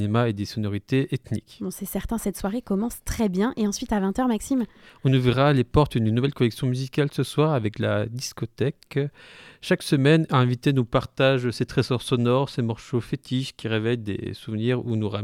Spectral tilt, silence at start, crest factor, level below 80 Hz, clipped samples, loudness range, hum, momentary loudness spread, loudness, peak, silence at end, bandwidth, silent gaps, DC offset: -6.5 dB/octave; 0 s; 18 dB; -46 dBFS; under 0.1%; 4 LU; none; 10 LU; -24 LUFS; -6 dBFS; 0 s; 16.5 kHz; none; under 0.1%